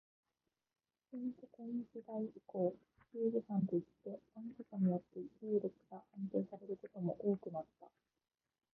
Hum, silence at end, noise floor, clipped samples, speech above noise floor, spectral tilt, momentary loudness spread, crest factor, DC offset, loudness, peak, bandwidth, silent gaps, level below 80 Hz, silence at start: none; 0.85 s; -90 dBFS; under 0.1%; 48 dB; -12.5 dB/octave; 15 LU; 18 dB; under 0.1%; -42 LUFS; -24 dBFS; 2.4 kHz; none; -84 dBFS; 1.1 s